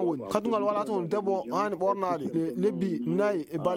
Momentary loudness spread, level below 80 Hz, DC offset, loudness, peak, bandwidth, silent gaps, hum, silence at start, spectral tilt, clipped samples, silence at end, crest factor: 3 LU; -68 dBFS; under 0.1%; -29 LUFS; -8 dBFS; 16.5 kHz; none; none; 0 s; -7 dB/octave; under 0.1%; 0 s; 20 dB